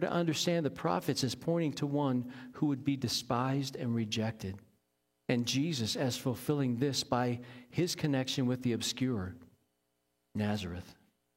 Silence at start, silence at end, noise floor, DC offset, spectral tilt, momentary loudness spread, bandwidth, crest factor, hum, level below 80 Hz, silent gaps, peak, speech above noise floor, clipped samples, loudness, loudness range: 0 s; 0.45 s; -80 dBFS; under 0.1%; -5 dB/octave; 9 LU; 16.5 kHz; 18 dB; none; -68 dBFS; none; -14 dBFS; 47 dB; under 0.1%; -33 LUFS; 2 LU